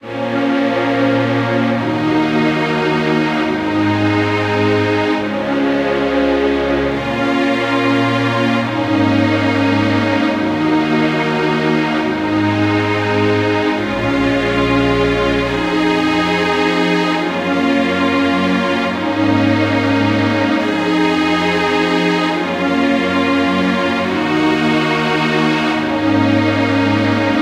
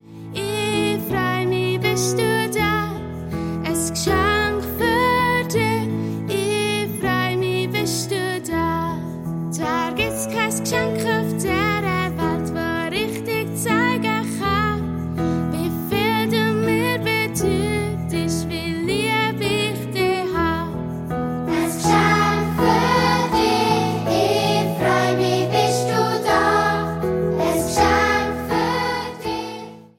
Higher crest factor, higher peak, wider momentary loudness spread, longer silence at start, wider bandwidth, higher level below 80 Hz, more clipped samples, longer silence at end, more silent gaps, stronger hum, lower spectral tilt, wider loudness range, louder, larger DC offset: about the same, 12 dB vs 16 dB; about the same, -2 dBFS vs -4 dBFS; second, 2 LU vs 8 LU; about the same, 0.05 s vs 0.05 s; second, 12 kHz vs 17 kHz; about the same, -40 dBFS vs -42 dBFS; neither; second, 0 s vs 0.15 s; neither; neither; about the same, -6 dB/octave vs -5 dB/octave; second, 1 LU vs 4 LU; first, -15 LUFS vs -20 LUFS; neither